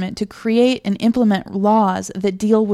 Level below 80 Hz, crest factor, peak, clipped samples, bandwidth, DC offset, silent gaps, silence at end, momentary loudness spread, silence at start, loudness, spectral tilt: -52 dBFS; 14 dB; -4 dBFS; under 0.1%; 12.5 kHz; under 0.1%; none; 0 s; 7 LU; 0 s; -17 LUFS; -6 dB/octave